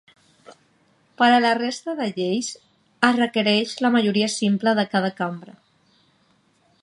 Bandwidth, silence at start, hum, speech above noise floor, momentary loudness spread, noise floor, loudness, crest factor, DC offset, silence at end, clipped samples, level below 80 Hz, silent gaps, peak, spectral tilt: 11 kHz; 0.5 s; none; 42 dB; 11 LU; -62 dBFS; -21 LUFS; 22 dB; under 0.1%; 1.35 s; under 0.1%; -74 dBFS; none; -2 dBFS; -4.5 dB/octave